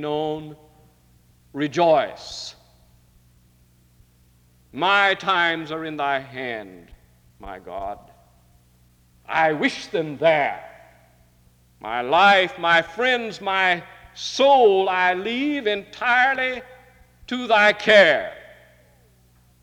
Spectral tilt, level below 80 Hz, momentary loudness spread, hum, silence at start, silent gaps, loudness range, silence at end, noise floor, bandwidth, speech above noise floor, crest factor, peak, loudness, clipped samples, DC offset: -4 dB/octave; -58 dBFS; 19 LU; 60 Hz at -65 dBFS; 0 s; none; 9 LU; 1.2 s; -57 dBFS; 15 kHz; 37 dB; 18 dB; -4 dBFS; -20 LUFS; under 0.1%; under 0.1%